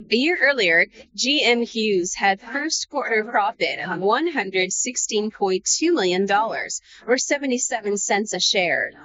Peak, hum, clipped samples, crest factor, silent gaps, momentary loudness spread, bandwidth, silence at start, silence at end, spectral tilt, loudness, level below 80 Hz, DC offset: -4 dBFS; none; under 0.1%; 16 dB; none; 6 LU; 8 kHz; 0 s; 0 s; -1 dB/octave; -21 LUFS; -64 dBFS; under 0.1%